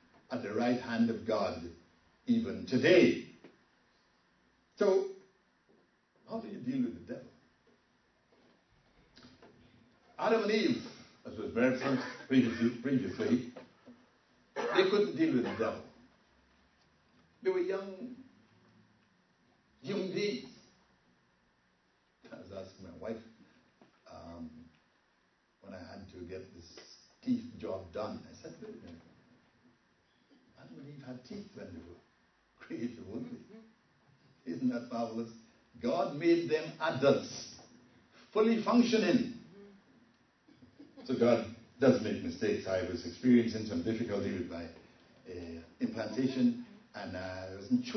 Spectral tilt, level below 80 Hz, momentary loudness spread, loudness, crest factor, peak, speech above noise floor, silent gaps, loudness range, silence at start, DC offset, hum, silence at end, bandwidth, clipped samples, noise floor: -6 dB/octave; -72 dBFS; 22 LU; -33 LUFS; 24 dB; -12 dBFS; 41 dB; none; 19 LU; 0.3 s; under 0.1%; none; 0 s; 6.4 kHz; under 0.1%; -73 dBFS